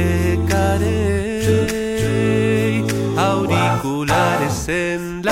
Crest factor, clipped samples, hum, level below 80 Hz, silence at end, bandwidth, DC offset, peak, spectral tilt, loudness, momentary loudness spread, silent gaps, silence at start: 14 dB; under 0.1%; none; -34 dBFS; 0 s; 16 kHz; under 0.1%; -4 dBFS; -6 dB/octave; -18 LUFS; 4 LU; none; 0 s